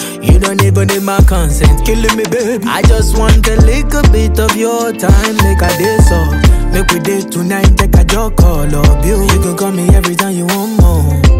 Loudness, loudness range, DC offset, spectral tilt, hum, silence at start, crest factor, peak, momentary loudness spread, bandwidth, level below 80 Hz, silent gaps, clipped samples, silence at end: -10 LUFS; 1 LU; under 0.1%; -5.5 dB/octave; none; 0 s; 8 dB; 0 dBFS; 4 LU; 16.5 kHz; -12 dBFS; none; under 0.1%; 0 s